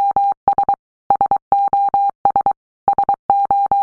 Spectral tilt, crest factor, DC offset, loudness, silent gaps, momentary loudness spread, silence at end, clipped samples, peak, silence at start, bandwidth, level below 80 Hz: -7.5 dB/octave; 14 dB; under 0.1%; -17 LUFS; 0.37-0.47 s, 0.79-1.10 s, 1.42-1.51 s, 2.15-2.25 s, 2.57-2.87 s, 3.19-3.29 s; 5 LU; 0 s; under 0.1%; -2 dBFS; 0 s; 4.2 kHz; -50 dBFS